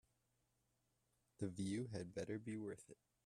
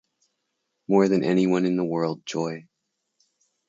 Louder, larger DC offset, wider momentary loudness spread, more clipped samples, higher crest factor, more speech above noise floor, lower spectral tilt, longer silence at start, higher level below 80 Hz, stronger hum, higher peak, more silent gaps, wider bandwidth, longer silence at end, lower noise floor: second, -48 LUFS vs -23 LUFS; neither; second, 9 LU vs 12 LU; neither; about the same, 20 dB vs 18 dB; second, 37 dB vs 57 dB; about the same, -6.5 dB/octave vs -7 dB/octave; first, 1.4 s vs 0.9 s; second, -80 dBFS vs -70 dBFS; neither; second, -30 dBFS vs -6 dBFS; neither; first, 13 kHz vs 7.8 kHz; second, 0.3 s vs 1.05 s; first, -85 dBFS vs -79 dBFS